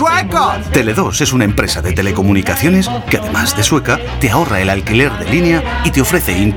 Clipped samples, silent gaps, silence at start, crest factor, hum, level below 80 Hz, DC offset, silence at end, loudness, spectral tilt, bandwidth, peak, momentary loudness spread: under 0.1%; none; 0 s; 12 dB; none; -26 dBFS; under 0.1%; 0 s; -13 LUFS; -4.5 dB/octave; over 20 kHz; 0 dBFS; 3 LU